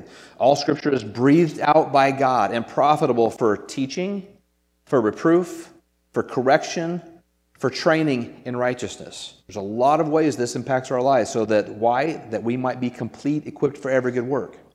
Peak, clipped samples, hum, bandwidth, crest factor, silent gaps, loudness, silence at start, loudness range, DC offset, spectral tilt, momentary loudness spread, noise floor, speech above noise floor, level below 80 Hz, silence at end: -2 dBFS; under 0.1%; none; 13.5 kHz; 20 dB; none; -21 LUFS; 0 s; 5 LU; under 0.1%; -6 dB/octave; 11 LU; -65 dBFS; 44 dB; -64 dBFS; 0.2 s